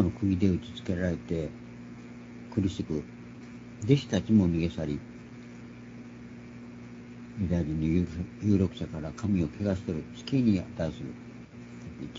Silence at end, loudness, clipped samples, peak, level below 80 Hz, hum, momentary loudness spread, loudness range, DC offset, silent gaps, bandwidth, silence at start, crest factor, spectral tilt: 0 s; -30 LUFS; under 0.1%; -8 dBFS; -50 dBFS; 60 Hz at -45 dBFS; 19 LU; 5 LU; under 0.1%; none; 7.8 kHz; 0 s; 22 dB; -7.5 dB/octave